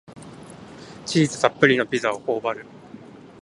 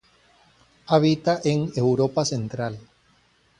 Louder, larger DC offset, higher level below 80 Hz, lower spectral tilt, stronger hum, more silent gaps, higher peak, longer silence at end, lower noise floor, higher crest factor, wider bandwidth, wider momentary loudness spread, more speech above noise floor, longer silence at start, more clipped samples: about the same, -21 LUFS vs -23 LUFS; neither; about the same, -62 dBFS vs -58 dBFS; about the same, -5 dB/octave vs -6 dB/octave; neither; neither; first, 0 dBFS vs -4 dBFS; second, 0.2 s vs 0.8 s; second, -43 dBFS vs -61 dBFS; about the same, 24 dB vs 20 dB; about the same, 11.5 kHz vs 11 kHz; first, 25 LU vs 11 LU; second, 22 dB vs 39 dB; second, 0.1 s vs 0.9 s; neither